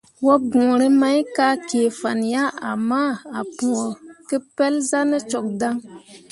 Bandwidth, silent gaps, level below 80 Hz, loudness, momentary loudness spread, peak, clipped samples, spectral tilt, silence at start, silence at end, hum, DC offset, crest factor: 11.5 kHz; none; -66 dBFS; -20 LUFS; 10 LU; -2 dBFS; under 0.1%; -4 dB/octave; 0.2 s; 0.15 s; none; under 0.1%; 18 dB